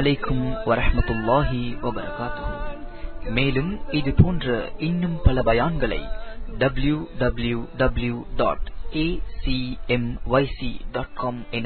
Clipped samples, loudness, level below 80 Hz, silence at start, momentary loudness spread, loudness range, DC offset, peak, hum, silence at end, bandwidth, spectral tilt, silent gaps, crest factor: under 0.1%; -24 LUFS; -30 dBFS; 0 s; 10 LU; 3 LU; under 0.1%; -2 dBFS; none; 0 s; 4.5 kHz; -11.5 dB/octave; none; 20 dB